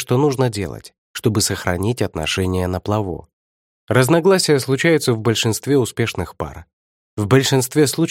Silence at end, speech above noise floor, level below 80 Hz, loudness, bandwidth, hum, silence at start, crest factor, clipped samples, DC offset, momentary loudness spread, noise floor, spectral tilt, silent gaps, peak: 0 s; over 72 dB; -46 dBFS; -18 LUFS; 17 kHz; none; 0 s; 18 dB; under 0.1%; under 0.1%; 14 LU; under -90 dBFS; -5 dB/octave; 0.98-1.14 s, 3.33-3.87 s, 6.73-7.17 s; 0 dBFS